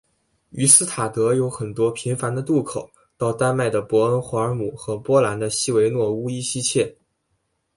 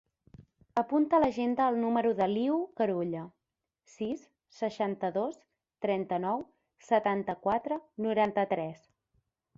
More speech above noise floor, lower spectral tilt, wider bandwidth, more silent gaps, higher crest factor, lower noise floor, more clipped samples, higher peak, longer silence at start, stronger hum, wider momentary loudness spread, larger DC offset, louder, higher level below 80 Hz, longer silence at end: second, 51 dB vs 58 dB; second, -4 dB/octave vs -7 dB/octave; first, 11.5 kHz vs 7.6 kHz; neither; about the same, 22 dB vs 18 dB; second, -71 dBFS vs -87 dBFS; neither; first, 0 dBFS vs -14 dBFS; first, 0.55 s vs 0.4 s; neither; about the same, 12 LU vs 10 LU; neither; first, -20 LUFS vs -31 LUFS; first, -58 dBFS vs -68 dBFS; about the same, 0.85 s vs 0.8 s